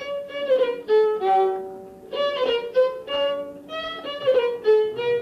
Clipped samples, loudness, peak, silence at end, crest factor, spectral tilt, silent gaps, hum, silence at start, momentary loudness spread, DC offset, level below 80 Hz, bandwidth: under 0.1%; -23 LUFS; -10 dBFS; 0 s; 12 dB; -4.5 dB/octave; none; none; 0 s; 12 LU; under 0.1%; -64 dBFS; 7.2 kHz